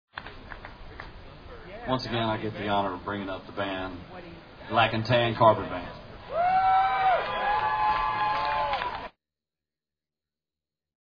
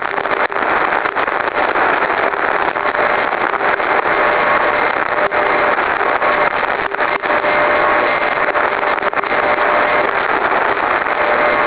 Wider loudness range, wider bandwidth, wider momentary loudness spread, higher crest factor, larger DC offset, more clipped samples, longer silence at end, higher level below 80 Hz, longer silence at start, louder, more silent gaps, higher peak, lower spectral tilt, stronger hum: first, 7 LU vs 1 LU; first, 5.2 kHz vs 4 kHz; first, 22 LU vs 3 LU; first, 22 dB vs 14 dB; neither; neither; first, 1.9 s vs 0 s; about the same, -50 dBFS vs -46 dBFS; first, 0.15 s vs 0 s; second, -26 LUFS vs -14 LUFS; neither; second, -6 dBFS vs 0 dBFS; about the same, -7 dB/octave vs -7 dB/octave; neither